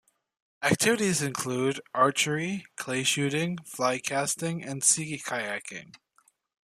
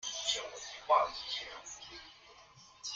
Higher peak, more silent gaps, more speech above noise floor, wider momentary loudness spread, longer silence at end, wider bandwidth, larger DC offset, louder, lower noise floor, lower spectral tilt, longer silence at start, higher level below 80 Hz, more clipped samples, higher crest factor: first, -8 dBFS vs -16 dBFS; neither; first, 39 dB vs 24 dB; second, 10 LU vs 23 LU; first, 0.8 s vs 0 s; first, 15 kHz vs 9.6 kHz; neither; first, -27 LUFS vs -35 LUFS; first, -67 dBFS vs -59 dBFS; first, -3 dB/octave vs 0.5 dB/octave; first, 0.6 s vs 0 s; about the same, -68 dBFS vs -70 dBFS; neither; about the same, 22 dB vs 22 dB